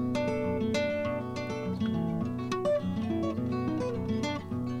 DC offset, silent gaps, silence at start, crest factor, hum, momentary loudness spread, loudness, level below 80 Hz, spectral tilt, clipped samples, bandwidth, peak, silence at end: under 0.1%; none; 0 s; 14 dB; none; 5 LU; -31 LUFS; -56 dBFS; -7 dB/octave; under 0.1%; 12 kHz; -18 dBFS; 0 s